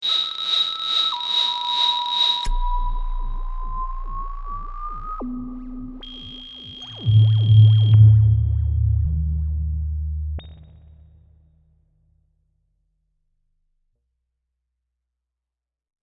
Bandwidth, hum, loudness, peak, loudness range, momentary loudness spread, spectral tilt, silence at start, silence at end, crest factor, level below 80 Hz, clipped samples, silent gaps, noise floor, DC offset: 7 kHz; none; -19 LUFS; -4 dBFS; 16 LU; 21 LU; -6 dB/octave; 0 s; 5.55 s; 18 dB; -30 dBFS; under 0.1%; none; -87 dBFS; under 0.1%